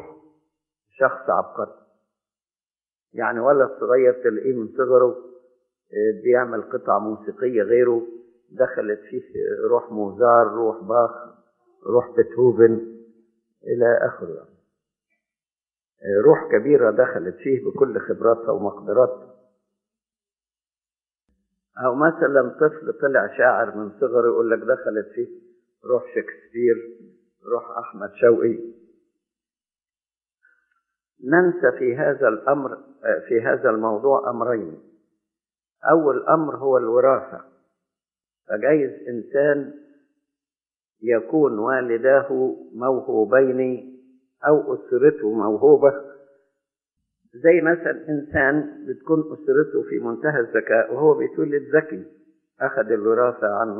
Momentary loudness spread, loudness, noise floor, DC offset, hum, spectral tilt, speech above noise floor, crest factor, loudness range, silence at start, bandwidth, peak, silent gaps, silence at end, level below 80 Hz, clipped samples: 13 LU; -20 LUFS; under -90 dBFS; under 0.1%; none; -12 dB/octave; over 70 dB; 20 dB; 5 LU; 0.05 s; 3 kHz; -2 dBFS; none; 0 s; -66 dBFS; under 0.1%